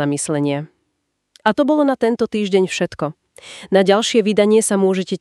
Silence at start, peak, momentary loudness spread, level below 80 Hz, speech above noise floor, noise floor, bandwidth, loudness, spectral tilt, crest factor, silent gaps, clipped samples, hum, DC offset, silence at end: 0 s; 0 dBFS; 12 LU; -60 dBFS; 55 dB; -72 dBFS; 13 kHz; -17 LUFS; -4.5 dB/octave; 18 dB; none; under 0.1%; none; under 0.1%; 0.05 s